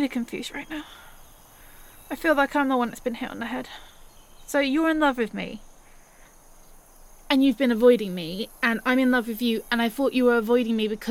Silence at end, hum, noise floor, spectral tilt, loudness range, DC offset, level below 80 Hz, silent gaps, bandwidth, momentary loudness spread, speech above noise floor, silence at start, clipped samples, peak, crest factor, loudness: 0 s; none; -51 dBFS; -4.5 dB/octave; 5 LU; under 0.1%; -52 dBFS; none; 17 kHz; 14 LU; 28 dB; 0 s; under 0.1%; -4 dBFS; 20 dB; -24 LUFS